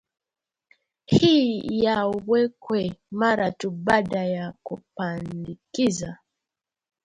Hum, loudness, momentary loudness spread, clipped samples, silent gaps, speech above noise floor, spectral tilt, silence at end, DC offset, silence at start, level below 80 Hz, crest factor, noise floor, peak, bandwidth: none; -24 LUFS; 15 LU; under 0.1%; none; 66 dB; -5.5 dB/octave; 0.9 s; under 0.1%; 1.1 s; -56 dBFS; 20 dB; -89 dBFS; -6 dBFS; 11 kHz